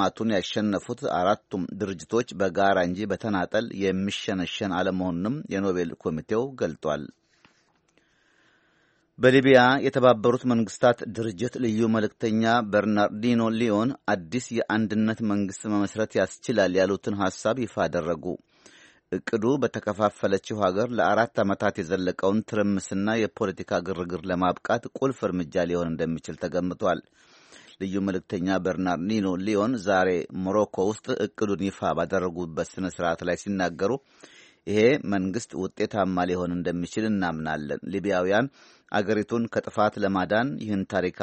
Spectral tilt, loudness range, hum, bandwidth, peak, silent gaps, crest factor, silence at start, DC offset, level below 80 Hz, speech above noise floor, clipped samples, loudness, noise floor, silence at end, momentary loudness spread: -6 dB/octave; 6 LU; none; 8.4 kHz; -4 dBFS; none; 22 dB; 0 s; under 0.1%; -60 dBFS; 41 dB; under 0.1%; -26 LUFS; -66 dBFS; 0 s; 8 LU